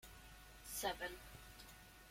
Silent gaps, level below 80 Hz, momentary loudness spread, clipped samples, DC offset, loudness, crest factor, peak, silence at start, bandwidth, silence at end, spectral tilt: none; -64 dBFS; 16 LU; under 0.1%; under 0.1%; -48 LUFS; 22 dB; -28 dBFS; 0 s; 16.5 kHz; 0 s; -2 dB/octave